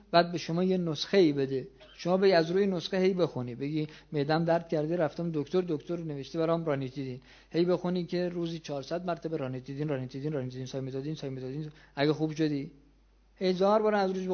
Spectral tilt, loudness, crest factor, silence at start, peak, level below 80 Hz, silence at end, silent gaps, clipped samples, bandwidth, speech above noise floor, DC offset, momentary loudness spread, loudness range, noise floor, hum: -7 dB/octave; -30 LUFS; 22 dB; 0.1 s; -8 dBFS; -64 dBFS; 0 s; none; under 0.1%; 6.8 kHz; 33 dB; under 0.1%; 12 LU; 7 LU; -62 dBFS; none